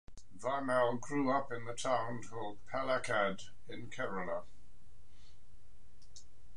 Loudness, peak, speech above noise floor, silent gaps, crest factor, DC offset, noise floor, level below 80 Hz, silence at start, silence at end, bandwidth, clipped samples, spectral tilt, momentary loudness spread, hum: -37 LUFS; -20 dBFS; 26 dB; none; 20 dB; 1%; -63 dBFS; -64 dBFS; 0.05 s; 0 s; 11 kHz; under 0.1%; -4.5 dB/octave; 13 LU; none